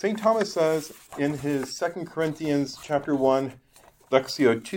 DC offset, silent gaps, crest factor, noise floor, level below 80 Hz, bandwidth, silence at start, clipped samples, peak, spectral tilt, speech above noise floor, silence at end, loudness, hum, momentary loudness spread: under 0.1%; none; 20 dB; -55 dBFS; -62 dBFS; 17 kHz; 0 s; under 0.1%; -6 dBFS; -5.5 dB/octave; 30 dB; 0 s; -26 LUFS; none; 7 LU